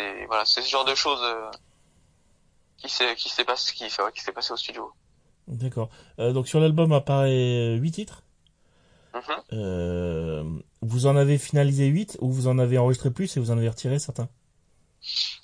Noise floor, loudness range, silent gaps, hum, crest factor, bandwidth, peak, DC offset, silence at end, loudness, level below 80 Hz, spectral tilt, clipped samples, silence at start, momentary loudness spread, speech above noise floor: -63 dBFS; 5 LU; none; none; 20 dB; 10.5 kHz; -4 dBFS; under 0.1%; 0.05 s; -24 LUFS; -54 dBFS; -5.5 dB/octave; under 0.1%; 0 s; 14 LU; 39 dB